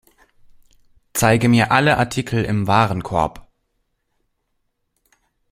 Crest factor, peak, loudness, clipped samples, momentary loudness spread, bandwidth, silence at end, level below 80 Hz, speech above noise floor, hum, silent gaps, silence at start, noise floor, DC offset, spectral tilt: 20 dB; 0 dBFS; -18 LUFS; under 0.1%; 8 LU; 16.5 kHz; 2.1 s; -46 dBFS; 54 dB; none; none; 1.15 s; -71 dBFS; under 0.1%; -5.5 dB/octave